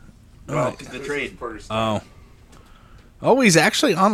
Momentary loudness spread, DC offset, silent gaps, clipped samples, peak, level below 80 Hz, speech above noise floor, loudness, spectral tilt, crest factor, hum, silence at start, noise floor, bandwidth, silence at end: 15 LU; under 0.1%; none; under 0.1%; -2 dBFS; -48 dBFS; 27 dB; -20 LUFS; -4 dB/octave; 20 dB; none; 0.45 s; -47 dBFS; 15.5 kHz; 0 s